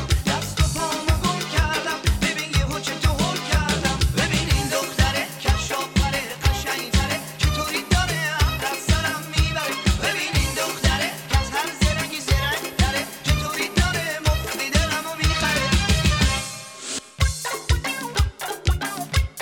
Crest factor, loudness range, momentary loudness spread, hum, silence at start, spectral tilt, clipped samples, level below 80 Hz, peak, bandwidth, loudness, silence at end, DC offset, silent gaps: 18 dB; 1 LU; 4 LU; none; 0 s; -4 dB/octave; under 0.1%; -26 dBFS; -4 dBFS; 19 kHz; -22 LUFS; 0 s; under 0.1%; none